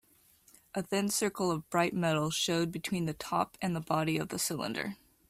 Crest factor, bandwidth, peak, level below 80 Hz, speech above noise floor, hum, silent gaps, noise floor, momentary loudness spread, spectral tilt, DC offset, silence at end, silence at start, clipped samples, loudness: 18 dB; 16 kHz; -14 dBFS; -66 dBFS; 32 dB; none; none; -64 dBFS; 6 LU; -4 dB/octave; under 0.1%; 0.35 s; 0.75 s; under 0.1%; -32 LUFS